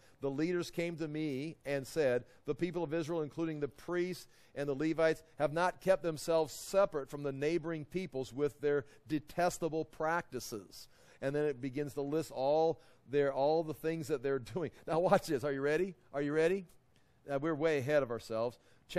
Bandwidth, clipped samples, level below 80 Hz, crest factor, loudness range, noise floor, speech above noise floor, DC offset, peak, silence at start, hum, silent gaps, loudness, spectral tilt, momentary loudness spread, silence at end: 14.5 kHz; under 0.1%; -64 dBFS; 22 dB; 3 LU; -67 dBFS; 32 dB; under 0.1%; -12 dBFS; 0.2 s; none; none; -35 LUFS; -6 dB/octave; 9 LU; 0 s